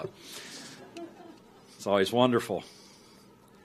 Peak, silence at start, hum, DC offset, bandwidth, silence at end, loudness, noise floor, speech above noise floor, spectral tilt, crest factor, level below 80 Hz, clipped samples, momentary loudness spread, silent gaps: -10 dBFS; 0 s; none; under 0.1%; 15 kHz; 0.95 s; -29 LUFS; -56 dBFS; 28 dB; -5 dB/octave; 22 dB; -72 dBFS; under 0.1%; 25 LU; none